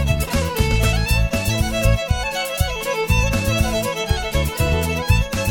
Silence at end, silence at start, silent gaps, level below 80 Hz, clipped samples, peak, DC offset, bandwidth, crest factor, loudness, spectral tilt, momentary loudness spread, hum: 0 s; 0 s; none; -24 dBFS; under 0.1%; -2 dBFS; under 0.1%; 17.5 kHz; 16 dB; -20 LUFS; -4.5 dB/octave; 4 LU; none